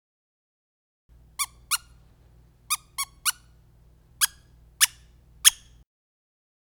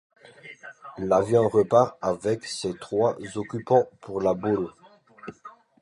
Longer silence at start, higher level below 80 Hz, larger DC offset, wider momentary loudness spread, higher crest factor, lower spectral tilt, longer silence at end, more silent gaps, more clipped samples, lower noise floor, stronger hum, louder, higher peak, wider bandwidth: first, 1.4 s vs 0.45 s; about the same, -58 dBFS vs -60 dBFS; neither; second, 12 LU vs 22 LU; first, 32 dB vs 20 dB; second, 3.5 dB/octave vs -6 dB/octave; first, 1.2 s vs 0.3 s; neither; neither; first, -56 dBFS vs -49 dBFS; neither; about the same, -24 LUFS vs -24 LUFS; first, 0 dBFS vs -6 dBFS; first, over 20 kHz vs 11.5 kHz